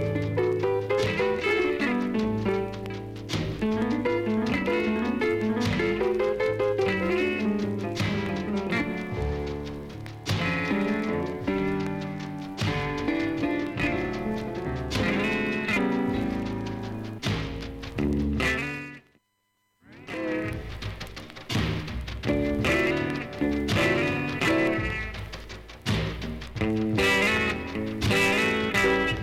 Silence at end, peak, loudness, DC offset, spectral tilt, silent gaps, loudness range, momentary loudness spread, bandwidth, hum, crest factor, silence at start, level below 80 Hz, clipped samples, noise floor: 0 s; -10 dBFS; -27 LUFS; under 0.1%; -5.5 dB/octave; none; 5 LU; 12 LU; 16 kHz; none; 16 dB; 0 s; -42 dBFS; under 0.1%; -74 dBFS